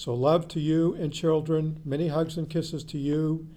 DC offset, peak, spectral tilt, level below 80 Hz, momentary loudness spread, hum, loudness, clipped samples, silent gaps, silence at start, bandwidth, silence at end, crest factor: under 0.1%; -10 dBFS; -7.5 dB/octave; -54 dBFS; 6 LU; none; -27 LUFS; under 0.1%; none; 0 s; 12.5 kHz; 0 s; 16 dB